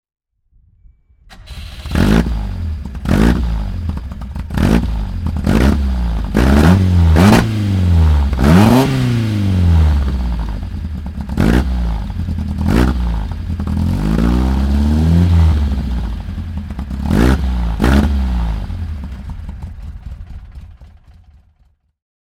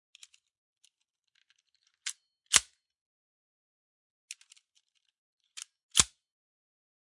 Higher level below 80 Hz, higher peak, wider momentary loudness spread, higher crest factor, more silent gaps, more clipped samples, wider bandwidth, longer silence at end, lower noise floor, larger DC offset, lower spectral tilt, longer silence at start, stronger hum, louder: first, -18 dBFS vs -62 dBFS; about the same, 0 dBFS vs 0 dBFS; second, 17 LU vs 23 LU; second, 14 dB vs 38 dB; second, none vs 3.01-4.28 s, 5.18-5.37 s, 5.83-5.89 s; neither; first, 15.5 kHz vs 11.5 kHz; first, 1.5 s vs 1.05 s; second, -56 dBFS vs -81 dBFS; neither; first, -7.5 dB/octave vs 1 dB/octave; second, 1.3 s vs 2.05 s; neither; first, -15 LUFS vs -28 LUFS